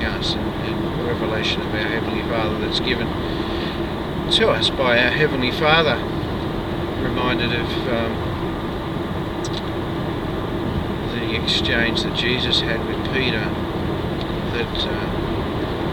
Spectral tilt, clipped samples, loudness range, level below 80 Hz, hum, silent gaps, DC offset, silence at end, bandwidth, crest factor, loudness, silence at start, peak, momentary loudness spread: -5.5 dB/octave; under 0.1%; 5 LU; -34 dBFS; none; none; under 0.1%; 0 s; 19 kHz; 20 dB; -21 LUFS; 0 s; -2 dBFS; 9 LU